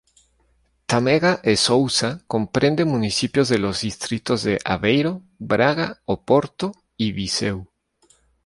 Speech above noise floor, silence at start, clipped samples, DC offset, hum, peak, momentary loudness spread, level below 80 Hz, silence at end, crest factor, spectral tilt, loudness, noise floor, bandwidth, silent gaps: 43 dB; 0.9 s; under 0.1%; under 0.1%; none; -2 dBFS; 9 LU; -50 dBFS; 0.8 s; 20 dB; -4.5 dB/octave; -21 LUFS; -63 dBFS; 11.5 kHz; none